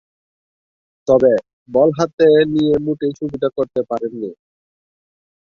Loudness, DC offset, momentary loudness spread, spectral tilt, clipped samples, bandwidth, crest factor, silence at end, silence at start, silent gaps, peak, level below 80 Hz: -17 LUFS; under 0.1%; 12 LU; -7 dB/octave; under 0.1%; 6.8 kHz; 16 dB; 1.15 s; 1.05 s; 1.53-1.66 s, 2.13-2.18 s; -2 dBFS; -54 dBFS